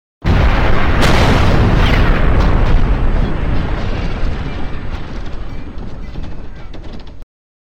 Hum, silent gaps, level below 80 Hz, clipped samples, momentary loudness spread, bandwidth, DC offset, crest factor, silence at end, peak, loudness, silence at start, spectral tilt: none; none; -16 dBFS; under 0.1%; 19 LU; 9.6 kHz; under 0.1%; 12 dB; 0.5 s; -2 dBFS; -15 LUFS; 0.2 s; -6.5 dB/octave